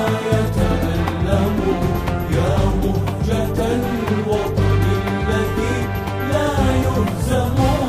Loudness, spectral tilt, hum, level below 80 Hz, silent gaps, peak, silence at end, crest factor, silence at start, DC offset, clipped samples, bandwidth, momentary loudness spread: -19 LUFS; -7 dB/octave; none; -26 dBFS; none; -4 dBFS; 0 s; 14 dB; 0 s; under 0.1%; under 0.1%; 15.5 kHz; 3 LU